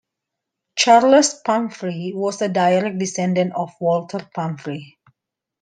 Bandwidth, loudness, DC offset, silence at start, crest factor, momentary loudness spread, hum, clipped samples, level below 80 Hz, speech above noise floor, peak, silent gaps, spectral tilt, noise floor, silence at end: 10 kHz; -19 LUFS; under 0.1%; 0.75 s; 18 dB; 15 LU; none; under 0.1%; -68 dBFS; 63 dB; -2 dBFS; none; -4.5 dB/octave; -82 dBFS; 0.75 s